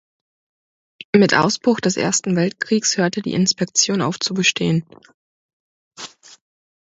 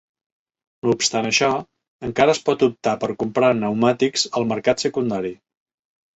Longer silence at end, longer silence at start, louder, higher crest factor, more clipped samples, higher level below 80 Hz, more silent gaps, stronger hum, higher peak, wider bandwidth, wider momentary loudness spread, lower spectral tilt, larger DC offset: about the same, 0.8 s vs 0.8 s; first, 1.15 s vs 0.85 s; about the same, -18 LUFS vs -20 LUFS; about the same, 20 dB vs 18 dB; neither; about the same, -60 dBFS vs -56 dBFS; first, 5.14-5.91 s vs 1.88-1.99 s; neither; about the same, 0 dBFS vs -2 dBFS; about the same, 8.2 kHz vs 8.2 kHz; about the same, 7 LU vs 9 LU; about the same, -3.5 dB/octave vs -4 dB/octave; neither